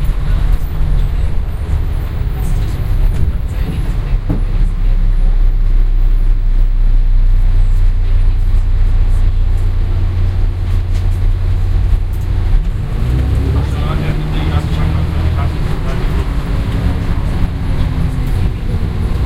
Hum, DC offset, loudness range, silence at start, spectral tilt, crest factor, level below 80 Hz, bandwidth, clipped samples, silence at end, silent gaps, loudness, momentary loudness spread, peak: none; under 0.1%; 2 LU; 0 s; -7.5 dB/octave; 12 dB; -12 dBFS; 5 kHz; under 0.1%; 0 s; none; -17 LUFS; 3 LU; 0 dBFS